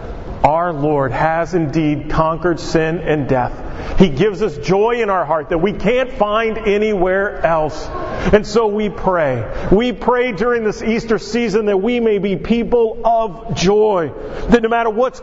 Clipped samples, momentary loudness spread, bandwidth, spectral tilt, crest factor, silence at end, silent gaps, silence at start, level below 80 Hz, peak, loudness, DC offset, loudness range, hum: under 0.1%; 5 LU; 8 kHz; -6.5 dB/octave; 16 dB; 0 s; none; 0 s; -30 dBFS; 0 dBFS; -16 LUFS; under 0.1%; 1 LU; none